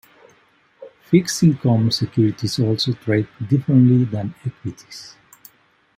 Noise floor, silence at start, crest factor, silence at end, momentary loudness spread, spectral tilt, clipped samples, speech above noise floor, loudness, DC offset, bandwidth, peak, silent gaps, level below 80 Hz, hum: -58 dBFS; 0.8 s; 18 dB; 0.9 s; 17 LU; -6.5 dB/octave; under 0.1%; 40 dB; -18 LUFS; under 0.1%; 16 kHz; -2 dBFS; none; -58 dBFS; none